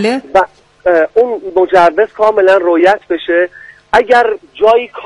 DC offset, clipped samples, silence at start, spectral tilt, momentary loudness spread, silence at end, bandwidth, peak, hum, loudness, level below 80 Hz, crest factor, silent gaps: under 0.1%; 0.1%; 0 s; -5 dB/octave; 6 LU; 0 s; 11 kHz; 0 dBFS; none; -11 LUFS; -46 dBFS; 10 dB; none